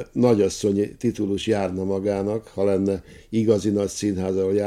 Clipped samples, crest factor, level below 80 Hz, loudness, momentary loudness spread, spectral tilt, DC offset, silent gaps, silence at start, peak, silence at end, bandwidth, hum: under 0.1%; 18 dB; -54 dBFS; -23 LUFS; 6 LU; -6.5 dB/octave; under 0.1%; none; 0 s; -4 dBFS; 0 s; 13.5 kHz; none